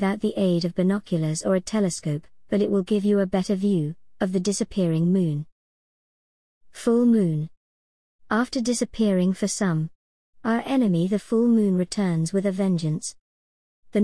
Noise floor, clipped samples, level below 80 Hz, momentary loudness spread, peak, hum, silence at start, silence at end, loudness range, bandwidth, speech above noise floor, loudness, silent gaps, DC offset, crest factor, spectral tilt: under -90 dBFS; under 0.1%; -56 dBFS; 9 LU; -10 dBFS; none; 0 s; 0 s; 3 LU; 12 kHz; over 68 dB; -24 LUFS; 5.52-6.61 s, 7.57-8.19 s, 9.95-10.33 s, 13.21-13.83 s; 0.3%; 14 dB; -6.5 dB/octave